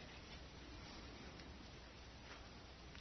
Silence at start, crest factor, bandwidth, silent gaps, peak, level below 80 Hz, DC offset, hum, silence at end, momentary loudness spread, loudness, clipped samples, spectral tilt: 0 s; 18 dB; 6.2 kHz; none; -38 dBFS; -62 dBFS; under 0.1%; none; 0 s; 3 LU; -56 LUFS; under 0.1%; -3.5 dB/octave